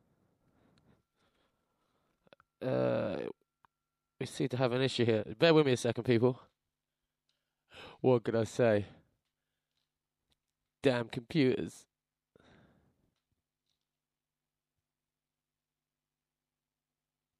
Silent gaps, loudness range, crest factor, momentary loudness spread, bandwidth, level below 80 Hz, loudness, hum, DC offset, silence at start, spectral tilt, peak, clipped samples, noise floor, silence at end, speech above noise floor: none; 9 LU; 22 dB; 16 LU; 12.5 kHz; -74 dBFS; -31 LUFS; none; under 0.1%; 2.6 s; -6 dB/octave; -14 dBFS; under 0.1%; under -90 dBFS; 5.6 s; over 60 dB